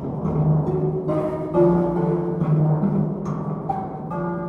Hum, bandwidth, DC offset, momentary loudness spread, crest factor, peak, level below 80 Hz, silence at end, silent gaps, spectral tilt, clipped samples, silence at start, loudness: none; 3.3 kHz; under 0.1%; 9 LU; 16 dB; -6 dBFS; -46 dBFS; 0 s; none; -11.5 dB/octave; under 0.1%; 0 s; -22 LUFS